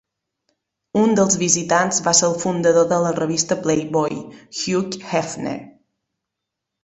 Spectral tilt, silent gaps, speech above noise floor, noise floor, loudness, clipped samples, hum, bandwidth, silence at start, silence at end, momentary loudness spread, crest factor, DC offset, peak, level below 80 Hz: -3.5 dB/octave; none; 63 dB; -82 dBFS; -19 LUFS; under 0.1%; none; 8.4 kHz; 0.95 s; 1.15 s; 11 LU; 18 dB; under 0.1%; -2 dBFS; -58 dBFS